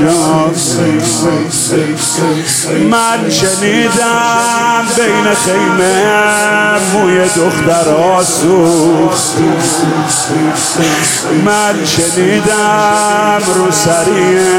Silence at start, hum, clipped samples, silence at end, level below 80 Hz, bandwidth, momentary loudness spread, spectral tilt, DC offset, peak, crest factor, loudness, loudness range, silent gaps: 0 s; none; under 0.1%; 0 s; -46 dBFS; 17 kHz; 3 LU; -3.5 dB/octave; under 0.1%; 0 dBFS; 10 dB; -10 LUFS; 1 LU; none